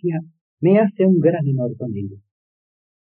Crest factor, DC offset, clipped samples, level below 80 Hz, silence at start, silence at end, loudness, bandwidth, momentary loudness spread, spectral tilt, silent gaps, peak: 16 dB; under 0.1%; under 0.1%; -70 dBFS; 0.05 s; 0.85 s; -18 LUFS; 3.4 kHz; 14 LU; -9.5 dB/octave; 0.41-0.57 s; -4 dBFS